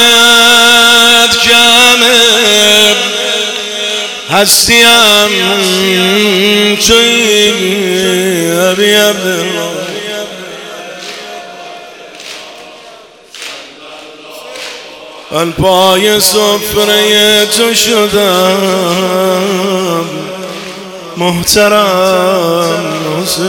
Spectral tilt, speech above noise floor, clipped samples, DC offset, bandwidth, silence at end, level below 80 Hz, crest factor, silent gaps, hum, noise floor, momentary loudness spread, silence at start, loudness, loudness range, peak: -2 dB/octave; 26 dB; 1%; under 0.1%; over 20 kHz; 0 s; -42 dBFS; 10 dB; none; none; -35 dBFS; 21 LU; 0 s; -7 LUFS; 20 LU; 0 dBFS